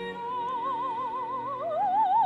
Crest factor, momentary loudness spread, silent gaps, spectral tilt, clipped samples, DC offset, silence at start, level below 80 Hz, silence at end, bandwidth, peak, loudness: 12 dB; 8 LU; none; -6 dB/octave; under 0.1%; under 0.1%; 0 s; -68 dBFS; 0 s; 8 kHz; -16 dBFS; -30 LUFS